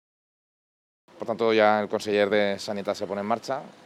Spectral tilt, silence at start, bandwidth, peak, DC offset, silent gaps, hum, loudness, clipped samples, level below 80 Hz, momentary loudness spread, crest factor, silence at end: -5 dB/octave; 1.2 s; 14 kHz; -6 dBFS; under 0.1%; none; none; -25 LUFS; under 0.1%; -76 dBFS; 11 LU; 20 dB; 0.15 s